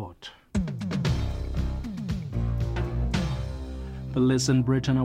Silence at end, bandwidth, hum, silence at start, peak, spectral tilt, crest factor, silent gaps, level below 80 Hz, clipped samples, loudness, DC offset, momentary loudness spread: 0 s; 12.5 kHz; none; 0 s; -12 dBFS; -6.5 dB/octave; 16 dB; none; -34 dBFS; under 0.1%; -28 LUFS; under 0.1%; 13 LU